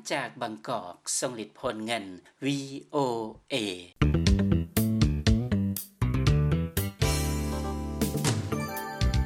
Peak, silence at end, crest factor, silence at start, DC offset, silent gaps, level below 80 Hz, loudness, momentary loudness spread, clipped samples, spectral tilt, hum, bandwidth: -10 dBFS; 0 s; 18 dB; 0.05 s; under 0.1%; none; -36 dBFS; -29 LUFS; 10 LU; under 0.1%; -5.5 dB/octave; none; 17 kHz